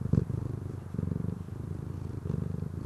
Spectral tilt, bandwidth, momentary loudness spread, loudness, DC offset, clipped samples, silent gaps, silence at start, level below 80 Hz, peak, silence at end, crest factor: -10 dB/octave; 12.5 kHz; 8 LU; -35 LUFS; under 0.1%; under 0.1%; none; 0 s; -44 dBFS; -12 dBFS; 0 s; 22 dB